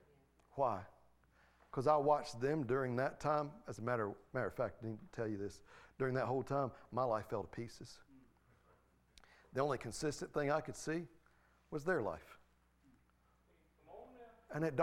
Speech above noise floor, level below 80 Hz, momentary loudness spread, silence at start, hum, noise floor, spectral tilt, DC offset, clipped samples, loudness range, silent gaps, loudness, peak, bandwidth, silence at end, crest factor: 34 dB; -68 dBFS; 16 LU; 0.55 s; 60 Hz at -70 dBFS; -73 dBFS; -6 dB/octave; under 0.1%; under 0.1%; 7 LU; none; -40 LUFS; -18 dBFS; 16 kHz; 0 s; 22 dB